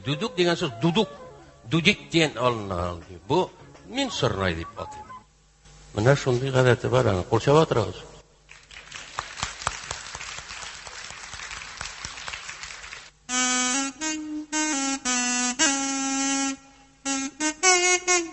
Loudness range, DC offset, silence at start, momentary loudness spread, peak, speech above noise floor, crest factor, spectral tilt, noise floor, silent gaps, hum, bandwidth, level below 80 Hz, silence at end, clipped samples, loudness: 11 LU; under 0.1%; 0 s; 17 LU; -2 dBFS; 32 dB; 24 dB; -3.5 dB/octave; -55 dBFS; none; none; 8.6 kHz; -48 dBFS; 0 s; under 0.1%; -24 LUFS